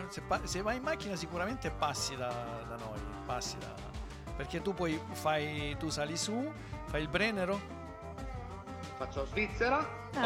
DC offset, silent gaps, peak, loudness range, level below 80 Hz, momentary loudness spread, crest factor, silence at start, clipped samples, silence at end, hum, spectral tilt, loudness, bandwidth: under 0.1%; none; -18 dBFS; 4 LU; -50 dBFS; 13 LU; 20 dB; 0 s; under 0.1%; 0 s; none; -4 dB/octave; -37 LUFS; 17 kHz